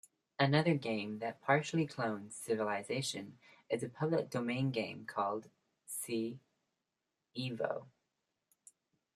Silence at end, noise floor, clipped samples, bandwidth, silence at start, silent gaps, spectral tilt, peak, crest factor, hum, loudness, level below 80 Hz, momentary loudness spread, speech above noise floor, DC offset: 1.25 s; -88 dBFS; under 0.1%; 14 kHz; 0.4 s; none; -5.5 dB/octave; -14 dBFS; 24 dB; none; -37 LUFS; -80 dBFS; 13 LU; 52 dB; under 0.1%